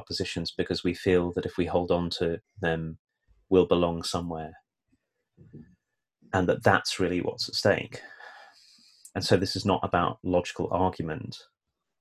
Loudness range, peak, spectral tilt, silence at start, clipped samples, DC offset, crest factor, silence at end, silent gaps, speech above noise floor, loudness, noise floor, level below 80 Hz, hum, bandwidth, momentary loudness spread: 3 LU; -6 dBFS; -5.5 dB/octave; 0 s; under 0.1%; under 0.1%; 24 dB; 0.6 s; 2.99-3.05 s; 47 dB; -27 LUFS; -74 dBFS; -48 dBFS; none; 14.5 kHz; 14 LU